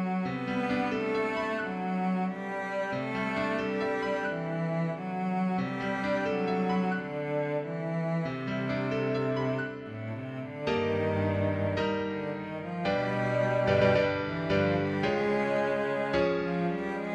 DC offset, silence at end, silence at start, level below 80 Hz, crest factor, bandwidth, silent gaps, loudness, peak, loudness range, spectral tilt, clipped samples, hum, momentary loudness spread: under 0.1%; 0 s; 0 s; -58 dBFS; 18 dB; 9.2 kHz; none; -30 LUFS; -12 dBFS; 4 LU; -7.5 dB/octave; under 0.1%; none; 6 LU